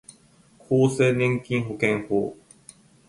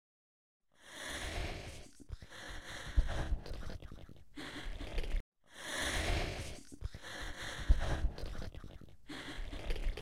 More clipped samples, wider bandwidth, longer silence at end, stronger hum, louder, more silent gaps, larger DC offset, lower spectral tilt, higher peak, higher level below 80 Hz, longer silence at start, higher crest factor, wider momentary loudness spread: neither; second, 11.5 kHz vs 15.5 kHz; first, 0.75 s vs 0 s; neither; first, -23 LUFS vs -42 LUFS; second, none vs 5.20-5.32 s; second, under 0.1% vs 0.2%; first, -6.5 dB/octave vs -4 dB/octave; first, -6 dBFS vs -16 dBFS; second, -60 dBFS vs -40 dBFS; about the same, 0.7 s vs 0.6 s; second, 18 dB vs 24 dB; second, 7 LU vs 17 LU